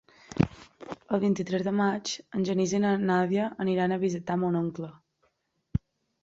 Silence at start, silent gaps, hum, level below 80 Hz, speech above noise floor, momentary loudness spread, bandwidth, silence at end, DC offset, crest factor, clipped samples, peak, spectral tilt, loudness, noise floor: 0.3 s; none; none; -52 dBFS; 47 dB; 14 LU; 7.8 kHz; 0.45 s; under 0.1%; 24 dB; under 0.1%; -6 dBFS; -6 dB/octave; -28 LUFS; -74 dBFS